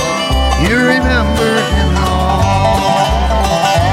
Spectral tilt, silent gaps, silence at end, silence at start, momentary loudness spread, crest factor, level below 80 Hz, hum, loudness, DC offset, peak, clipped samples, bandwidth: -5 dB/octave; none; 0 s; 0 s; 3 LU; 12 dB; -18 dBFS; none; -12 LUFS; under 0.1%; 0 dBFS; under 0.1%; 15.5 kHz